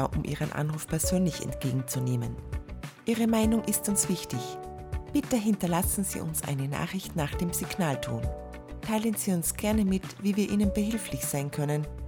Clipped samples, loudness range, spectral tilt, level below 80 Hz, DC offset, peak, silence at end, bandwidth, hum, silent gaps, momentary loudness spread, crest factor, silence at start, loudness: under 0.1%; 3 LU; -5 dB/octave; -42 dBFS; under 0.1%; -12 dBFS; 0 s; over 20 kHz; none; none; 10 LU; 16 dB; 0 s; -29 LUFS